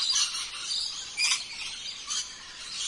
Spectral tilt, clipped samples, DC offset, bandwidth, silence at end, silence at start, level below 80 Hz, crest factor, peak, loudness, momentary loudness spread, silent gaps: 3 dB/octave; under 0.1%; under 0.1%; 11.5 kHz; 0 s; 0 s; -64 dBFS; 20 dB; -12 dBFS; -29 LUFS; 11 LU; none